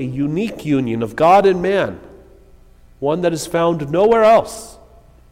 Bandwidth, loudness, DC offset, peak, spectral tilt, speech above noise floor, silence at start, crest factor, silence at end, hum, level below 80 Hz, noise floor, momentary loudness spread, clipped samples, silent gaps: 16 kHz; -16 LUFS; under 0.1%; -4 dBFS; -6 dB/octave; 30 dB; 0 s; 14 dB; 0.6 s; 60 Hz at -45 dBFS; -46 dBFS; -46 dBFS; 13 LU; under 0.1%; none